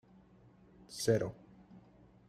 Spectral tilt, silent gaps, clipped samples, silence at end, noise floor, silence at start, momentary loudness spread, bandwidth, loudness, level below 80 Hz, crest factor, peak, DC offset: -5 dB/octave; none; under 0.1%; 0.5 s; -62 dBFS; 0.9 s; 26 LU; 15 kHz; -35 LUFS; -68 dBFS; 24 dB; -16 dBFS; under 0.1%